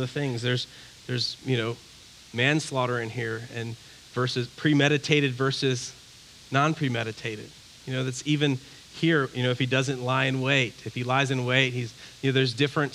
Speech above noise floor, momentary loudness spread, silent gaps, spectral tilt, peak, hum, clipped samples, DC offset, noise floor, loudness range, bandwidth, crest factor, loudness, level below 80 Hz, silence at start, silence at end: 24 dB; 14 LU; none; -5 dB/octave; -4 dBFS; none; under 0.1%; under 0.1%; -50 dBFS; 4 LU; 13 kHz; 22 dB; -26 LUFS; -64 dBFS; 0 s; 0 s